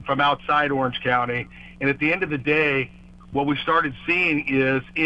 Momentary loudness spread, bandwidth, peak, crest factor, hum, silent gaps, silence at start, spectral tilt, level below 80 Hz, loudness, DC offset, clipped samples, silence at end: 7 LU; 8.2 kHz; -6 dBFS; 16 dB; none; none; 0 s; -7 dB/octave; -50 dBFS; -22 LUFS; under 0.1%; under 0.1%; 0 s